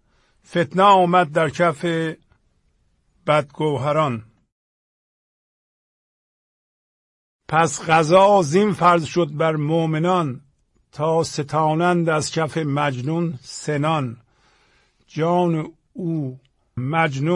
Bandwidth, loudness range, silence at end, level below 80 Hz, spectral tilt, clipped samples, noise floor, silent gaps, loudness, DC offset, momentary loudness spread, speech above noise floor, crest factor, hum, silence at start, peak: 11.5 kHz; 7 LU; 0 s; -60 dBFS; -6 dB/octave; under 0.1%; -64 dBFS; 4.52-7.39 s; -19 LUFS; under 0.1%; 14 LU; 45 dB; 18 dB; none; 0.5 s; -2 dBFS